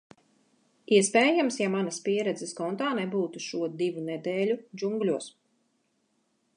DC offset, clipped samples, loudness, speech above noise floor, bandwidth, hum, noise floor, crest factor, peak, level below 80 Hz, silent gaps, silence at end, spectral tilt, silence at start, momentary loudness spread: under 0.1%; under 0.1%; -28 LUFS; 46 dB; 11.5 kHz; none; -73 dBFS; 20 dB; -8 dBFS; -84 dBFS; none; 1.25 s; -4 dB/octave; 0.9 s; 11 LU